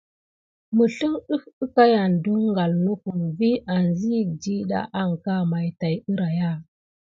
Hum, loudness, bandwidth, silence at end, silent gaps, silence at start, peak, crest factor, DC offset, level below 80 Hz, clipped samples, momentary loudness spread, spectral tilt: none; -23 LUFS; 7.4 kHz; 0.5 s; 1.53-1.61 s; 0.7 s; -4 dBFS; 20 dB; under 0.1%; -60 dBFS; under 0.1%; 9 LU; -8 dB/octave